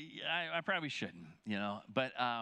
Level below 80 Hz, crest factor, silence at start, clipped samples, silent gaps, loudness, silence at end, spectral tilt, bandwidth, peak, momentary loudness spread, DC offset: -84 dBFS; 22 dB; 0 s; under 0.1%; none; -38 LUFS; 0 s; -4.5 dB/octave; 10 kHz; -18 dBFS; 7 LU; under 0.1%